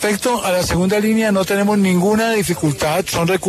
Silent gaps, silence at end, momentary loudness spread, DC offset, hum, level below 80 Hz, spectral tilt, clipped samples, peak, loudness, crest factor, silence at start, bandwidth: none; 0 s; 3 LU; under 0.1%; none; -40 dBFS; -5 dB/octave; under 0.1%; -6 dBFS; -16 LUFS; 10 dB; 0 s; 14 kHz